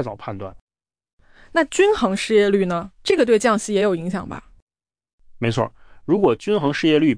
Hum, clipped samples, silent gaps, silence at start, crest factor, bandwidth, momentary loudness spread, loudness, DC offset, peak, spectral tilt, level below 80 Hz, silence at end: none; under 0.1%; 0.61-0.67 s, 1.13-1.18 s, 4.62-4.67 s, 5.13-5.18 s; 0 s; 16 dB; 10.5 kHz; 15 LU; -19 LUFS; under 0.1%; -6 dBFS; -5.5 dB/octave; -50 dBFS; 0 s